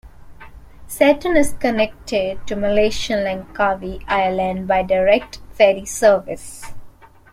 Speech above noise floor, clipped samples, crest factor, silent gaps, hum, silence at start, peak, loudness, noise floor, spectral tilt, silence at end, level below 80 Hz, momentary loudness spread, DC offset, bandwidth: 23 dB; under 0.1%; 18 dB; none; none; 0.05 s; -2 dBFS; -18 LUFS; -40 dBFS; -4.5 dB/octave; 0.25 s; -40 dBFS; 11 LU; under 0.1%; 16 kHz